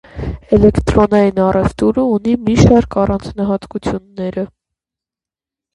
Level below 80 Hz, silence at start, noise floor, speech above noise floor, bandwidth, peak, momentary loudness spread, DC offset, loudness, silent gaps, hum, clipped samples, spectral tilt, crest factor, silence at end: -28 dBFS; 0.15 s; -89 dBFS; 76 dB; 11 kHz; 0 dBFS; 12 LU; under 0.1%; -14 LUFS; none; none; under 0.1%; -7.5 dB/octave; 14 dB; 1.3 s